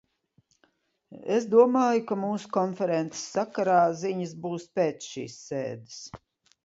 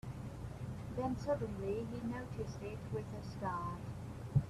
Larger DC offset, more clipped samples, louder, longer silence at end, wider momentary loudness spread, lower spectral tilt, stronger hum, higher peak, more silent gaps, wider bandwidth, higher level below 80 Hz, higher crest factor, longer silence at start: neither; neither; first, -27 LUFS vs -42 LUFS; first, 0.5 s vs 0 s; first, 17 LU vs 9 LU; second, -5.5 dB/octave vs -8 dB/octave; neither; first, -6 dBFS vs -20 dBFS; neither; second, 7.8 kHz vs 13.5 kHz; second, -70 dBFS vs -56 dBFS; about the same, 20 dB vs 20 dB; first, 1.1 s vs 0.05 s